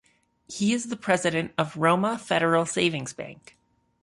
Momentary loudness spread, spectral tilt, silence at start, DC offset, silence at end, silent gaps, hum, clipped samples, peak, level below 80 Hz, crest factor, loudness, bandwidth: 14 LU; -4.5 dB/octave; 0.5 s; under 0.1%; 0.7 s; none; none; under 0.1%; -8 dBFS; -64 dBFS; 18 dB; -25 LUFS; 11.5 kHz